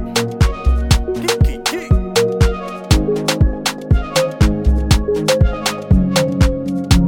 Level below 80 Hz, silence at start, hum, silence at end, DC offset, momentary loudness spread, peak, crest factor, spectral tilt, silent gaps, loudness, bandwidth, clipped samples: -18 dBFS; 0 s; none; 0 s; under 0.1%; 4 LU; 0 dBFS; 14 dB; -5.5 dB/octave; none; -16 LUFS; 17 kHz; under 0.1%